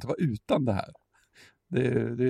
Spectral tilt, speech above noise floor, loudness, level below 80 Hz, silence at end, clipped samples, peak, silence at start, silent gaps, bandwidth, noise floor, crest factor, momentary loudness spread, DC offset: -8 dB/octave; 32 dB; -29 LUFS; -60 dBFS; 0 s; under 0.1%; -12 dBFS; 0 s; none; 12.5 kHz; -59 dBFS; 16 dB; 6 LU; under 0.1%